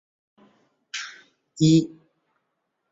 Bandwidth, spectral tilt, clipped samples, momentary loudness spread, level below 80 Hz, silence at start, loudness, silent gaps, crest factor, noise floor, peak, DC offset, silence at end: 7.8 kHz; -6 dB/octave; under 0.1%; 18 LU; -62 dBFS; 0.95 s; -23 LUFS; none; 20 dB; -77 dBFS; -6 dBFS; under 0.1%; 1.05 s